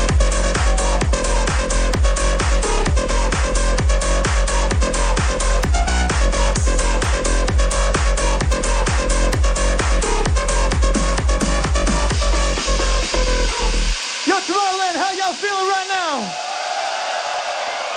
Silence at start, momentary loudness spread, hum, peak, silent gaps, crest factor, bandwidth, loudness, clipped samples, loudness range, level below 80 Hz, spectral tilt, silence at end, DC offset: 0 s; 2 LU; none; -4 dBFS; none; 14 dB; 10 kHz; -19 LUFS; under 0.1%; 1 LU; -20 dBFS; -3.5 dB/octave; 0 s; under 0.1%